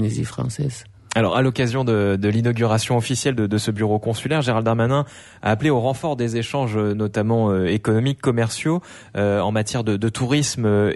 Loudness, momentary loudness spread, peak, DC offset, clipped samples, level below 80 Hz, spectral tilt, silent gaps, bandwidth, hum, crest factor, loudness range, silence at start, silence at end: -21 LUFS; 6 LU; -6 dBFS; under 0.1%; under 0.1%; -52 dBFS; -6 dB/octave; none; 11.5 kHz; none; 14 dB; 1 LU; 0 s; 0 s